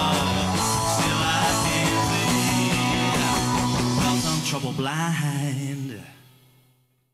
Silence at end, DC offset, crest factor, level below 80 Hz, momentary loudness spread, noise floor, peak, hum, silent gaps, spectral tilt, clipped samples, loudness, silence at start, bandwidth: 1 s; under 0.1%; 10 dB; -44 dBFS; 6 LU; -63 dBFS; -12 dBFS; none; none; -4 dB/octave; under 0.1%; -22 LUFS; 0 s; 16 kHz